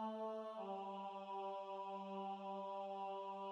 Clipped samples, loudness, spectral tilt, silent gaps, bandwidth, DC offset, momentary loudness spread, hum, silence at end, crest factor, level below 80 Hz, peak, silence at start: under 0.1%; -48 LUFS; -6.5 dB/octave; none; 9.8 kHz; under 0.1%; 1 LU; none; 0 s; 12 dB; under -90 dBFS; -36 dBFS; 0 s